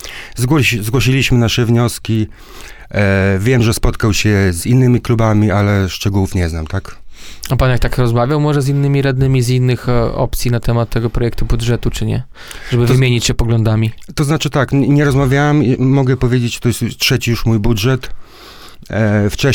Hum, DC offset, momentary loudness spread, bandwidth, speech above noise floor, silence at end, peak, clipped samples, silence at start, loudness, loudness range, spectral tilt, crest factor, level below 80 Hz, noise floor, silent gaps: none; under 0.1%; 8 LU; 18 kHz; 22 dB; 0 s; 0 dBFS; under 0.1%; 0 s; -14 LUFS; 3 LU; -6 dB/octave; 12 dB; -26 dBFS; -36 dBFS; none